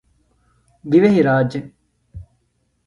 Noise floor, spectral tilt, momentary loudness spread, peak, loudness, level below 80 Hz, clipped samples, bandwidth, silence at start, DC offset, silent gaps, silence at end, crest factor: -66 dBFS; -8.5 dB/octave; 17 LU; -2 dBFS; -16 LUFS; -50 dBFS; under 0.1%; 10.5 kHz; 0.85 s; under 0.1%; none; 0.65 s; 18 dB